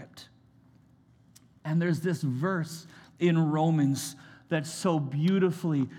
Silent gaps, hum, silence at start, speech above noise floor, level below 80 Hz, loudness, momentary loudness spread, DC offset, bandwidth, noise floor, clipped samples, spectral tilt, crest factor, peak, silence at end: none; none; 0 s; 33 dB; -76 dBFS; -28 LUFS; 13 LU; under 0.1%; 15.5 kHz; -60 dBFS; under 0.1%; -6.5 dB/octave; 16 dB; -12 dBFS; 0 s